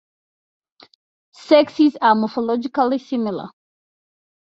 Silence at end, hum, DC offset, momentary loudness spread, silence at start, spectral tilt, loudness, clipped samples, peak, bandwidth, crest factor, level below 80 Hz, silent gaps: 1 s; none; under 0.1%; 11 LU; 1.4 s; -6.5 dB/octave; -18 LUFS; under 0.1%; -2 dBFS; 7.8 kHz; 18 dB; -68 dBFS; none